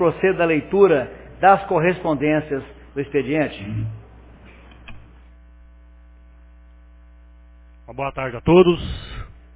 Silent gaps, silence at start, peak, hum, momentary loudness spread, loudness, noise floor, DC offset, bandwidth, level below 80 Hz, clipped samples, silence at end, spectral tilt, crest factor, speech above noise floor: none; 0 s; -2 dBFS; 60 Hz at -45 dBFS; 18 LU; -19 LUFS; -46 dBFS; under 0.1%; 4 kHz; -42 dBFS; under 0.1%; 0.3 s; -11 dB/octave; 20 dB; 28 dB